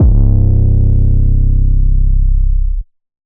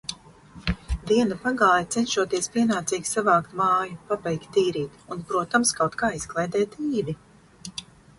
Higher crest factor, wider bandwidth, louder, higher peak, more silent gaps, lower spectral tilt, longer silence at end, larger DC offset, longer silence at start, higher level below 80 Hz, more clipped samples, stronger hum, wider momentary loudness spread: second, 8 dB vs 18 dB; second, 1 kHz vs 11.5 kHz; first, -14 LUFS vs -24 LUFS; first, 0 dBFS vs -6 dBFS; neither; first, -17 dB/octave vs -4 dB/octave; about the same, 0.4 s vs 0.35 s; neither; about the same, 0 s vs 0.1 s; first, -10 dBFS vs -44 dBFS; neither; neither; second, 7 LU vs 14 LU